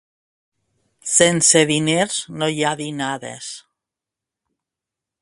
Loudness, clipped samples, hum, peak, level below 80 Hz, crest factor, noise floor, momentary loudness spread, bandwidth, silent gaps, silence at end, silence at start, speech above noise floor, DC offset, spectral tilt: -17 LUFS; under 0.1%; none; 0 dBFS; -62 dBFS; 22 dB; -86 dBFS; 19 LU; 11.5 kHz; none; 1.6 s; 1.05 s; 68 dB; under 0.1%; -2.5 dB/octave